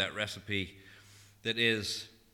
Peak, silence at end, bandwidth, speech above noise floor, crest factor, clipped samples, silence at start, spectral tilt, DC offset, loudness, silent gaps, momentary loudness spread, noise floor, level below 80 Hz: -16 dBFS; 0.25 s; 19 kHz; 24 dB; 20 dB; under 0.1%; 0 s; -3.5 dB/octave; under 0.1%; -33 LUFS; none; 11 LU; -58 dBFS; -66 dBFS